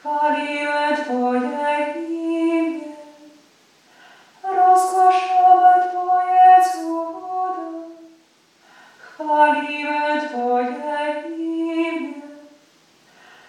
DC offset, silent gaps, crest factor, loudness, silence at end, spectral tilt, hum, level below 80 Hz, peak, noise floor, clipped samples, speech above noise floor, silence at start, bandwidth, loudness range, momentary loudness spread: under 0.1%; none; 18 dB; -18 LUFS; 1.05 s; -2.5 dB/octave; none; -86 dBFS; -2 dBFS; -56 dBFS; under 0.1%; 35 dB; 0.05 s; 13 kHz; 9 LU; 16 LU